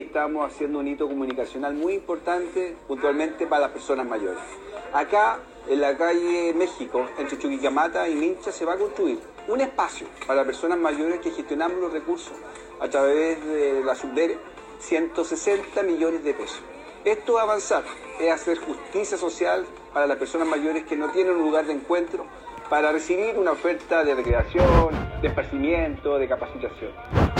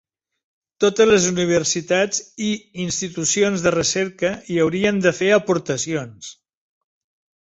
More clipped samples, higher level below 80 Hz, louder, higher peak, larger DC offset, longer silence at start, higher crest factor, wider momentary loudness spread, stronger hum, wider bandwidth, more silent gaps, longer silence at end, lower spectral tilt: neither; first, -40 dBFS vs -54 dBFS; second, -25 LUFS vs -19 LUFS; about the same, -4 dBFS vs -2 dBFS; neither; second, 0 s vs 0.8 s; about the same, 20 dB vs 18 dB; about the same, 9 LU vs 9 LU; neither; first, 10 kHz vs 8.2 kHz; neither; second, 0 s vs 1.1 s; first, -5.5 dB/octave vs -3.5 dB/octave